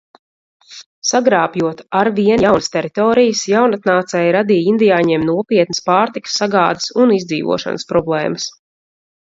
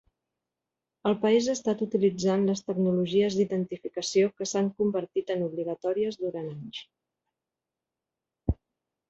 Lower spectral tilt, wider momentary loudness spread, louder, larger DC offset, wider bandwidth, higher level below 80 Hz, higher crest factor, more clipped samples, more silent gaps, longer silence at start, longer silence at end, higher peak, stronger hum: about the same, -4.5 dB/octave vs -5.5 dB/octave; second, 6 LU vs 10 LU; first, -15 LUFS vs -28 LUFS; neither; about the same, 7.8 kHz vs 8.2 kHz; about the same, -52 dBFS vs -50 dBFS; about the same, 14 dB vs 16 dB; neither; first, 0.86-1.02 s vs none; second, 0.7 s vs 1.05 s; first, 0.85 s vs 0.55 s; first, 0 dBFS vs -12 dBFS; neither